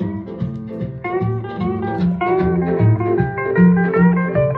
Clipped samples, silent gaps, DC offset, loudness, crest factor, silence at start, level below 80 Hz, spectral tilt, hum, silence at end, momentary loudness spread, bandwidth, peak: under 0.1%; none; under 0.1%; -18 LUFS; 14 dB; 0 s; -42 dBFS; -11.5 dB/octave; none; 0 s; 12 LU; 4.3 kHz; -2 dBFS